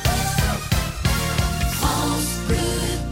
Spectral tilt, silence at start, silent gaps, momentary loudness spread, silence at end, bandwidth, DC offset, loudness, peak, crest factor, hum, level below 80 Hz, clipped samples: -4 dB/octave; 0 s; none; 2 LU; 0 s; 16.5 kHz; under 0.1%; -22 LUFS; -8 dBFS; 14 dB; none; -28 dBFS; under 0.1%